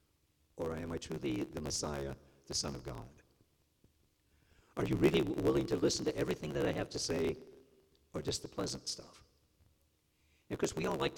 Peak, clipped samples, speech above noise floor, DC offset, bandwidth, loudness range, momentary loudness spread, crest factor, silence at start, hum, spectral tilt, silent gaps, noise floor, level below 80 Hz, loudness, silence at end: -16 dBFS; under 0.1%; 39 dB; under 0.1%; 18 kHz; 8 LU; 14 LU; 22 dB; 0.55 s; none; -4.5 dB/octave; none; -75 dBFS; -58 dBFS; -37 LUFS; 0 s